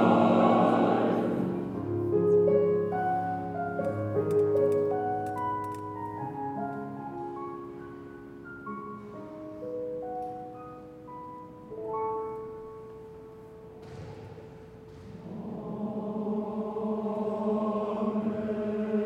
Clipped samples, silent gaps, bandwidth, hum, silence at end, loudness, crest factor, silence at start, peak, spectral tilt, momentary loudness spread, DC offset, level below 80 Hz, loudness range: under 0.1%; none; 9.6 kHz; none; 0 s; -30 LUFS; 20 dB; 0 s; -10 dBFS; -8.5 dB/octave; 21 LU; under 0.1%; -62 dBFS; 13 LU